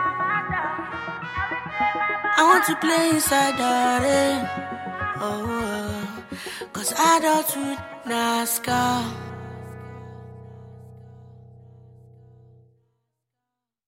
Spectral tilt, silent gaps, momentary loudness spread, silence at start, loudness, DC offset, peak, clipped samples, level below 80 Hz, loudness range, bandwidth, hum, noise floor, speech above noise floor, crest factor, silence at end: -3 dB/octave; none; 19 LU; 0 s; -22 LUFS; under 0.1%; -4 dBFS; under 0.1%; -54 dBFS; 10 LU; 16.5 kHz; 60 Hz at -65 dBFS; -84 dBFS; 62 dB; 20 dB; 2.2 s